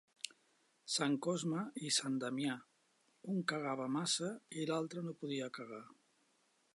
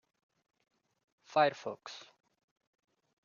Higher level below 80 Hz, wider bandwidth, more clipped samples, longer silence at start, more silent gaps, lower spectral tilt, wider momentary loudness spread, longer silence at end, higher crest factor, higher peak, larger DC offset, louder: about the same, under -90 dBFS vs under -90 dBFS; first, 11.5 kHz vs 7 kHz; neither; second, 0.25 s vs 1.3 s; neither; first, -3.5 dB/octave vs -2 dB/octave; second, 13 LU vs 19 LU; second, 0.85 s vs 1.25 s; about the same, 22 dB vs 24 dB; second, -18 dBFS vs -14 dBFS; neither; second, -39 LUFS vs -33 LUFS